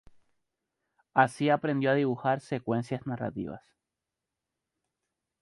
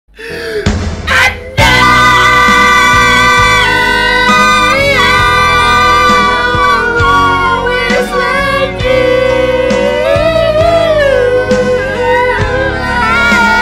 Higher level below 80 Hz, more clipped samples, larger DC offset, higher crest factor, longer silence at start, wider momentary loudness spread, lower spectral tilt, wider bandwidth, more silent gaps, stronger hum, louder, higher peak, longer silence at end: second, -68 dBFS vs -24 dBFS; neither; neither; first, 24 dB vs 8 dB; first, 1.15 s vs 0.2 s; first, 11 LU vs 7 LU; first, -7 dB/octave vs -4 dB/octave; second, 11.5 kHz vs 16.5 kHz; neither; neither; second, -29 LUFS vs -8 LUFS; second, -8 dBFS vs 0 dBFS; first, 1.85 s vs 0 s